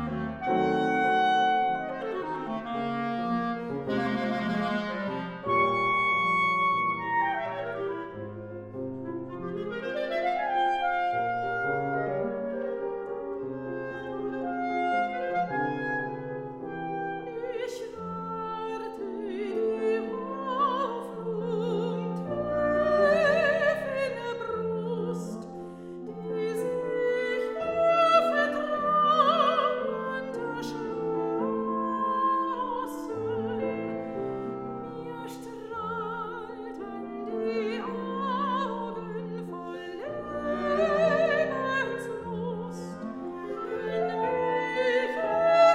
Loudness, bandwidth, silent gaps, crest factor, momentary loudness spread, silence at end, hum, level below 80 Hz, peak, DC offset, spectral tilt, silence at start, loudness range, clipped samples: -29 LUFS; 14.5 kHz; none; 20 dB; 13 LU; 0 s; none; -62 dBFS; -10 dBFS; under 0.1%; -6 dB/octave; 0 s; 7 LU; under 0.1%